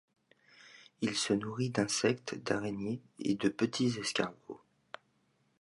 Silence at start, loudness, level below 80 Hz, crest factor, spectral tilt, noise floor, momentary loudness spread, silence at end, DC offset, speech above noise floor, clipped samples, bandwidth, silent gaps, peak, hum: 0.65 s; -34 LUFS; -72 dBFS; 20 dB; -4.5 dB/octave; -74 dBFS; 21 LU; 1.05 s; under 0.1%; 40 dB; under 0.1%; 11.5 kHz; none; -16 dBFS; none